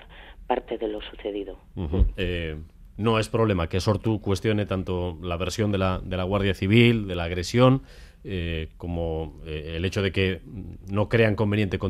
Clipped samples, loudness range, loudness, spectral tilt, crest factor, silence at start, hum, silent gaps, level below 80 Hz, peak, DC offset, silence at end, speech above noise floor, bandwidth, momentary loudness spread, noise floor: under 0.1%; 5 LU; -25 LUFS; -6.5 dB/octave; 20 dB; 0 s; none; none; -38 dBFS; -6 dBFS; under 0.1%; 0 s; 20 dB; 13.5 kHz; 14 LU; -45 dBFS